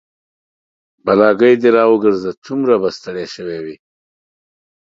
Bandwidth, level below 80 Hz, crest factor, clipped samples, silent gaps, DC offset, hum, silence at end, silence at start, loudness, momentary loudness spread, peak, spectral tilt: 7.6 kHz; -58 dBFS; 16 dB; under 0.1%; 2.37-2.42 s; under 0.1%; none; 1.2 s; 1.05 s; -14 LUFS; 15 LU; 0 dBFS; -6.5 dB/octave